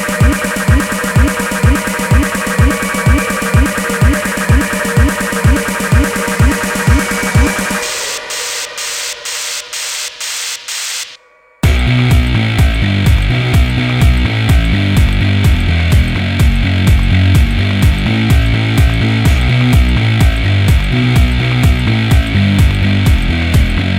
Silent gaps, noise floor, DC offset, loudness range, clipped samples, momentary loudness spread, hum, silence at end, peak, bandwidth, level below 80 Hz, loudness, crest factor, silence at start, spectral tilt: none; -43 dBFS; under 0.1%; 4 LU; under 0.1%; 7 LU; none; 0 s; 0 dBFS; 17 kHz; -16 dBFS; -12 LUFS; 12 dB; 0 s; -5 dB/octave